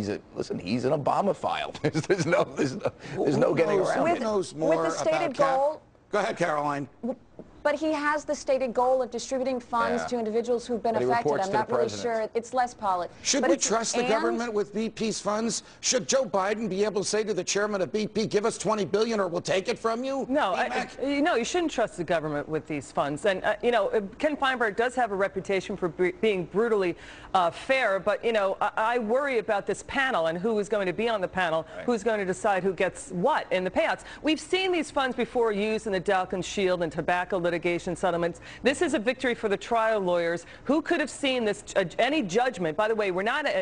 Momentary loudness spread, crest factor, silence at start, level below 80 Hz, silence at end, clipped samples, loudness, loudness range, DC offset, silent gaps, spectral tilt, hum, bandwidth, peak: 5 LU; 18 dB; 0 s; -58 dBFS; 0 s; under 0.1%; -27 LUFS; 2 LU; under 0.1%; none; -4 dB/octave; none; 10.5 kHz; -10 dBFS